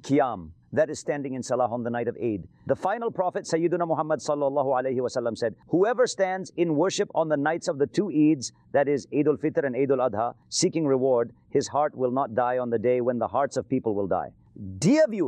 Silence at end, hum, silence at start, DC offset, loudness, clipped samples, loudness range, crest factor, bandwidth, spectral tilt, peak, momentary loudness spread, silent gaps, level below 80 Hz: 0 s; none; 0.05 s; under 0.1%; -26 LUFS; under 0.1%; 3 LU; 14 dB; 10 kHz; -5.5 dB/octave; -12 dBFS; 7 LU; none; -66 dBFS